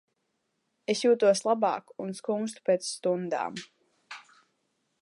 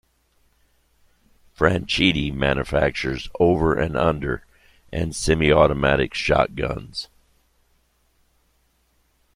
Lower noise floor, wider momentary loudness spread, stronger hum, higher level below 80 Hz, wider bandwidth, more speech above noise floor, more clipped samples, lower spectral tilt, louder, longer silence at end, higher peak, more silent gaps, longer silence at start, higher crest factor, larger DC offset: first, -78 dBFS vs -65 dBFS; first, 22 LU vs 12 LU; neither; second, -84 dBFS vs -38 dBFS; second, 11.5 kHz vs 15.5 kHz; first, 51 dB vs 44 dB; neither; second, -4 dB/octave vs -5.5 dB/octave; second, -28 LUFS vs -21 LUFS; second, 0.85 s vs 2.3 s; second, -12 dBFS vs -2 dBFS; neither; second, 0.9 s vs 1.6 s; about the same, 18 dB vs 22 dB; neither